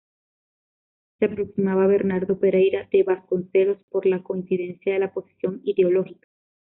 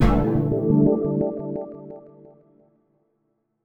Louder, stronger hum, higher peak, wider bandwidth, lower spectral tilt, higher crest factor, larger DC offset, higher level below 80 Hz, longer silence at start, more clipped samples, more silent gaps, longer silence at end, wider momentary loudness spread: about the same, -23 LUFS vs -22 LUFS; neither; about the same, -8 dBFS vs -6 dBFS; second, 3.8 kHz vs 7.6 kHz; second, -7 dB/octave vs -10 dB/octave; about the same, 16 dB vs 18 dB; neither; second, -64 dBFS vs -34 dBFS; first, 1.2 s vs 0 s; neither; first, 3.83-3.88 s vs none; second, 0.65 s vs 1.65 s; second, 8 LU vs 21 LU